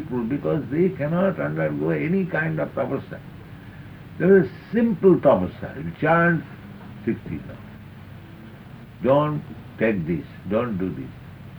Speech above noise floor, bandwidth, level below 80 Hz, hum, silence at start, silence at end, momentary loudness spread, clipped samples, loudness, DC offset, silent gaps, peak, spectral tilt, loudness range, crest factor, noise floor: 20 dB; over 20 kHz; -52 dBFS; none; 0 s; 0 s; 23 LU; under 0.1%; -22 LUFS; under 0.1%; none; -4 dBFS; -9.5 dB/octave; 6 LU; 18 dB; -41 dBFS